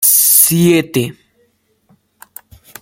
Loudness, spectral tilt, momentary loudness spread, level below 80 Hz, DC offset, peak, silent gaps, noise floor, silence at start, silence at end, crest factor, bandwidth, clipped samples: -9 LUFS; -3.5 dB/octave; 13 LU; -54 dBFS; under 0.1%; 0 dBFS; none; -59 dBFS; 0 s; 1.7 s; 14 dB; over 20 kHz; 0.1%